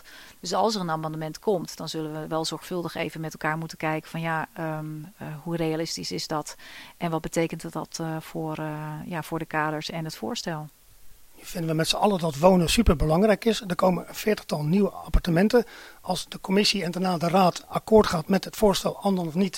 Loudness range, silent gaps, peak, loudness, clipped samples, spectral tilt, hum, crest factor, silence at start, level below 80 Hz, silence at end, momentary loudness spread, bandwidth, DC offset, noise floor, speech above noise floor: 8 LU; none; -4 dBFS; -26 LUFS; under 0.1%; -5 dB/octave; none; 22 dB; 0.05 s; -40 dBFS; 0 s; 13 LU; 16.5 kHz; under 0.1%; -46 dBFS; 21 dB